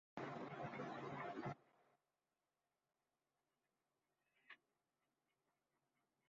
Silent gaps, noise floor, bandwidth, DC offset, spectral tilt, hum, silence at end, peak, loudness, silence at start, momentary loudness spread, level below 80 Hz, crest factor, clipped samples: none; under -90 dBFS; 7.4 kHz; under 0.1%; -5 dB/octave; none; 1.75 s; -34 dBFS; -51 LUFS; 0.15 s; 16 LU; -88 dBFS; 24 dB; under 0.1%